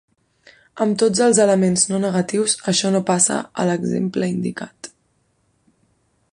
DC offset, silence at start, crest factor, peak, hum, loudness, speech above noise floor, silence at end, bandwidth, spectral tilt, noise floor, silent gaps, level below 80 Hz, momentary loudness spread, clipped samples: under 0.1%; 0.75 s; 18 dB; -2 dBFS; none; -18 LUFS; 47 dB; 1.45 s; 11 kHz; -4 dB/octave; -65 dBFS; none; -60 dBFS; 12 LU; under 0.1%